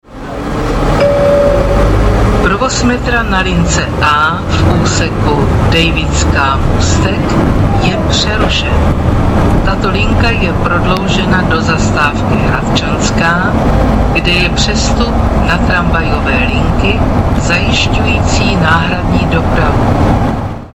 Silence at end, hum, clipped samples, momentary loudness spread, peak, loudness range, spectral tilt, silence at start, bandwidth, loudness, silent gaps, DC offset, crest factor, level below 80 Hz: 0.05 s; none; under 0.1%; 3 LU; 0 dBFS; 1 LU; -5.5 dB/octave; 0.1 s; 13.5 kHz; -11 LUFS; none; under 0.1%; 10 dB; -16 dBFS